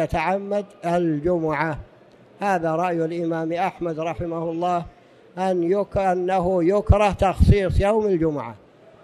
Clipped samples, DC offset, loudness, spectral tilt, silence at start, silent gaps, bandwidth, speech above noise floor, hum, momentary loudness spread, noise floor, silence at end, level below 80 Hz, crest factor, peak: under 0.1%; under 0.1%; -22 LUFS; -8 dB/octave; 0 s; none; 12.5 kHz; 29 dB; none; 9 LU; -50 dBFS; 0.45 s; -32 dBFS; 18 dB; -2 dBFS